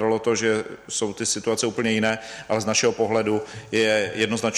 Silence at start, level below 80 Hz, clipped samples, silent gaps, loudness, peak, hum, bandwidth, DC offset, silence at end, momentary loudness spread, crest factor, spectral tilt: 0 s; -60 dBFS; under 0.1%; none; -23 LUFS; -6 dBFS; none; 13.5 kHz; under 0.1%; 0 s; 7 LU; 16 dB; -3 dB/octave